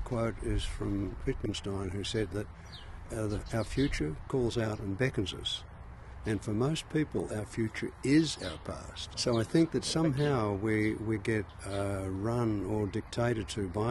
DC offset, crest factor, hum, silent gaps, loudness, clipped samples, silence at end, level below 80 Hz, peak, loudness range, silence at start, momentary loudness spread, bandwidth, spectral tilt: under 0.1%; 18 dB; none; none; -33 LUFS; under 0.1%; 0 s; -46 dBFS; -14 dBFS; 5 LU; 0 s; 11 LU; 12.5 kHz; -5.5 dB/octave